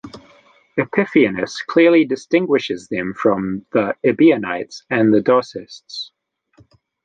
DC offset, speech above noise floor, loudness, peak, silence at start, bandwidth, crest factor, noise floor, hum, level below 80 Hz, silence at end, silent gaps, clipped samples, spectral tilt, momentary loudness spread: under 0.1%; 38 dB; -17 LUFS; -2 dBFS; 0.05 s; 8.8 kHz; 16 dB; -55 dBFS; none; -58 dBFS; 1 s; none; under 0.1%; -6 dB/octave; 16 LU